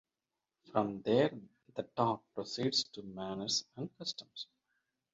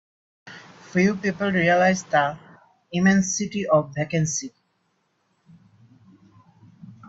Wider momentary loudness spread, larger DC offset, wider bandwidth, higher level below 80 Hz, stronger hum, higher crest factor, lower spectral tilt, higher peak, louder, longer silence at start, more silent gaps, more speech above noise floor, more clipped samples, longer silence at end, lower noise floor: second, 15 LU vs 23 LU; neither; about the same, 7.6 kHz vs 8 kHz; second, -74 dBFS vs -62 dBFS; neither; about the same, 22 dB vs 20 dB; about the same, -4 dB/octave vs -5 dB/octave; second, -16 dBFS vs -6 dBFS; second, -36 LUFS vs -22 LUFS; first, 0.7 s vs 0.45 s; neither; first, over 54 dB vs 49 dB; neither; first, 0.7 s vs 0.15 s; first, under -90 dBFS vs -70 dBFS